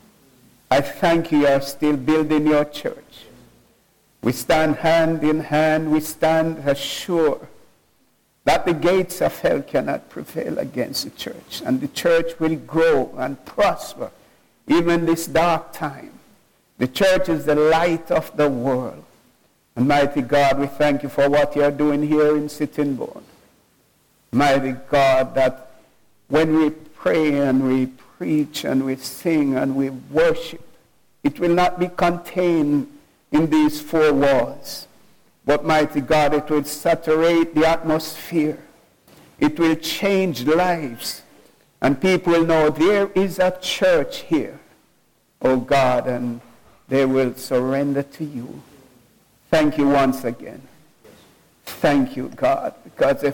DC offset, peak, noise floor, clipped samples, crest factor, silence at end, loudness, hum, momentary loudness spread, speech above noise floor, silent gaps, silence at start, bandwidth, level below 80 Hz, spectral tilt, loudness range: under 0.1%; -6 dBFS; -62 dBFS; under 0.1%; 14 dB; 0 s; -20 LUFS; none; 12 LU; 43 dB; none; 0.7 s; 17.5 kHz; -48 dBFS; -5.5 dB/octave; 3 LU